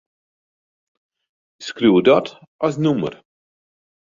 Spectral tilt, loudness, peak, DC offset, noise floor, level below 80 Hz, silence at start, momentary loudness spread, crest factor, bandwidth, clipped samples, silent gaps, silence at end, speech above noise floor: -6.5 dB/octave; -18 LUFS; -2 dBFS; under 0.1%; under -90 dBFS; -60 dBFS; 1.6 s; 19 LU; 20 dB; 7.6 kHz; under 0.1%; 2.47-2.59 s; 1.05 s; over 73 dB